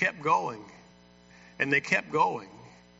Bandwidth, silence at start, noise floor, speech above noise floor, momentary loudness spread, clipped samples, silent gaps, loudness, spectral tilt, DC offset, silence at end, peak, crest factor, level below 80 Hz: 8 kHz; 0 s; -56 dBFS; 28 dB; 17 LU; under 0.1%; none; -27 LUFS; -2.5 dB/octave; under 0.1%; 0.3 s; -10 dBFS; 22 dB; -70 dBFS